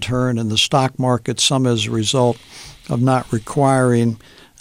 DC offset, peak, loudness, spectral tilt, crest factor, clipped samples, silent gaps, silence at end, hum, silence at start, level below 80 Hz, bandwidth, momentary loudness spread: under 0.1%; -2 dBFS; -17 LUFS; -5 dB/octave; 14 dB; under 0.1%; none; 0.45 s; none; 0 s; -48 dBFS; 15.5 kHz; 10 LU